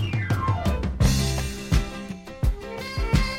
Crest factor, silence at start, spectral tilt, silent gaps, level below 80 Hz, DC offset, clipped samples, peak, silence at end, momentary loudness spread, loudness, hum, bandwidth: 16 dB; 0 s; -5.5 dB/octave; none; -28 dBFS; under 0.1%; under 0.1%; -8 dBFS; 0 s; 11 LU; -26 LUFS; none; 16.5 kHz